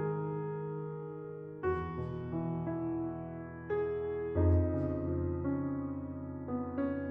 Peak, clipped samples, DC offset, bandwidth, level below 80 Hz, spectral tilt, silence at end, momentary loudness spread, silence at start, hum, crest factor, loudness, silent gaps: -18 dBFS; under 0.1%; under 0.1%; 3.6 kHz; -50 dBFS; -12 dB/octave; 0 s; 11 LU; 0 s; none; 16 dB; -36 LUFS; none